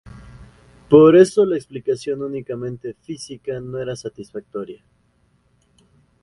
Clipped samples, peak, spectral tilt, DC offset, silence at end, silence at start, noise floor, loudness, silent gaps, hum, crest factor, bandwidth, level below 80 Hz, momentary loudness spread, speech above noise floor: under 0.1%; 0 dBFS; -7 dB/octave; under 0.1%; 1.45 s; 0.05 s; -61 dBFS; -17 LUFS; none; none; 20 dB; 11.5 kHz; -54 dBFS; 21 LU; 43 dB